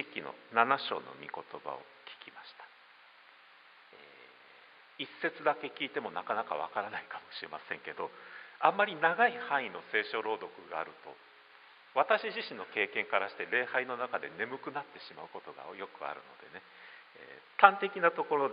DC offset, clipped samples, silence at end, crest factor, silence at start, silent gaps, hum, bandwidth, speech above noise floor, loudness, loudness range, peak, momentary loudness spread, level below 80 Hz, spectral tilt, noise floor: under 0.1%; under 0.1%; 0 s; 30 dB; 0 s; none; none; 5 kHz; 25 dB; -33 LUFS; 13 LU; -4 dBFS; 22 LU; -88 dBFS; -0.5 dB/octave; -59 dBFS